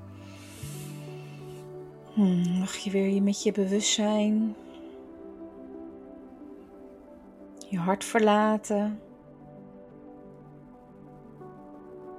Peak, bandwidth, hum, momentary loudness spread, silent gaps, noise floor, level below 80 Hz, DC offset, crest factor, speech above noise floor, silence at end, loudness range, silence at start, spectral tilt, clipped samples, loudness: -10 dBFS; 14 kHz; none; 25 LU; none; -50 dBFS; -64 dBFS; under 0.1%; 20 dB; 24 dB; 0 s; 13 LU; 0 s; -5 dB/octave; under 0.1%; -27 LUFS